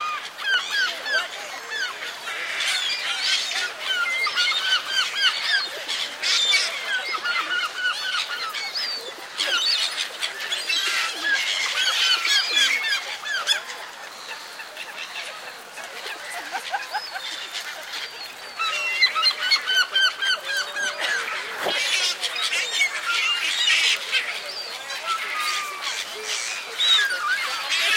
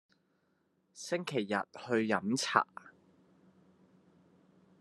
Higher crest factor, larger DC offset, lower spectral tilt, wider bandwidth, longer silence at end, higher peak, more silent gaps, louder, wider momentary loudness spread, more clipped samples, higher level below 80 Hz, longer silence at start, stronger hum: second, 18 dB vs 28 dB; neither; second, 2.5 dB/octave vs -4 dB/octave; first, 17 kHz vs 12.5 kHz; second, 0 s vs 1.9 s; about the same, -6 dBFS vs -8 dBFS; neither; first, -22 LUFS vs -33 LUFS; about the same, 13 LU vs 11 LU; neither; first, -80 dBFS vs -86 dBFS; second, 0 s vs 0.95 s; neither